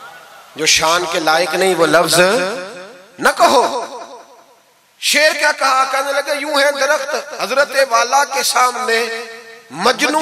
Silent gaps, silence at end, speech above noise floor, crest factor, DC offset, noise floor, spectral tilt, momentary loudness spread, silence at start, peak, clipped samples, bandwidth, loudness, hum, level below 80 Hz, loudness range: none; 0 s; 37 dB; 16 dB; under 0.1%; -51 dBFS; -1.5 dB/octave; 15 LU; 0 s; 0 dBFS; under 0.1%; 16 kHz; -14 LUFS; none; -56 dBFS; 2 LU